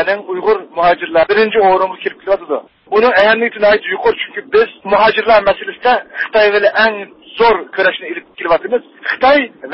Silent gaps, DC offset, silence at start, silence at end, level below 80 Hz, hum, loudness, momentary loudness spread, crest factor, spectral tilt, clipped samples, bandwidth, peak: none; under 0.1%; 0 s; 0 s; -48 dBFS; none; -13 LUFS; 10 LU; 14 dB; -6.5 dB/octave; under 0.1%; 5.8 kHz; 0 dBFS